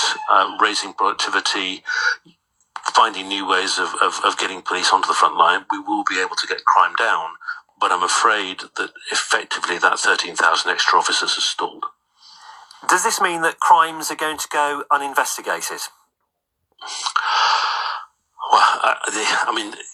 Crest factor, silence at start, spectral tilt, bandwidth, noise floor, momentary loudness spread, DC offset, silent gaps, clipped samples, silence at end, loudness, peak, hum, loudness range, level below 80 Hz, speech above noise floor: 20 dB; 0 s; 0 dB/octave; 15 kHz; -75 dBFS; 11 LU; under 0.1%; none; under 0.1%; 0 s; -18 LUFS; 0 dBFS; none; 3 LU; -72 dBFS; 56 dB